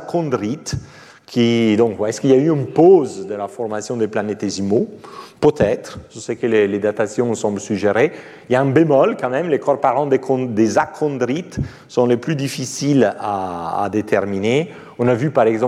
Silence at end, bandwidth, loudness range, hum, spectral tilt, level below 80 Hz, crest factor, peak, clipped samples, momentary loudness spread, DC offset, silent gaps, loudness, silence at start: 0 s; 13.5 kHz; 3 LU; none; -6 dB/octave; -50 dBFS; 16 dB; -2 dBFS; under 0.1%; 11 LU; under 0.1%; none; -18 LUFS; 0 s